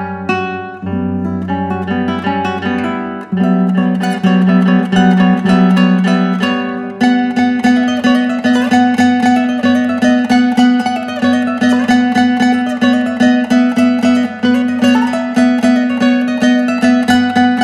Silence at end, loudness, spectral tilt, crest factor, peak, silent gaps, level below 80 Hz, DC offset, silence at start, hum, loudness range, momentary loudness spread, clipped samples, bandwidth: 0 s; -12 LUFS; -6.5 dB/octave; 12 dB; 0 dBFS; none; -50 dBFS; under 0.1%; 0 s; none; 3 LU; 7 LU; under 0.1%; 11 kHz